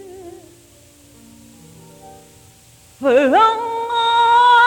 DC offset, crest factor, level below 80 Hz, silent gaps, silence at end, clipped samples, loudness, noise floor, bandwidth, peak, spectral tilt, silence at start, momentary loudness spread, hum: under 0.1%; 16 dB; -58 dBFS; none; 0 s; under 0.1%; -14 LUFS; -47 dBFS; 17.5 kHz; -2 dBFS; -3 dB/octave; 0 s; 15 LU; none